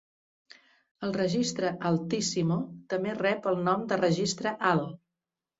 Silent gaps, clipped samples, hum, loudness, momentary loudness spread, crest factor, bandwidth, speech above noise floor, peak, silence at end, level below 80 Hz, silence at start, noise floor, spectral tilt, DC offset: none; under 0.1%; none; -29 LUFS; 6 LU; 18 dB; 8 kHz; 61 dB; -12 dBFS; 0.65 s; -68 dBFS; 1 s; -89 dBFS; -5 dB/octave; under 0.1%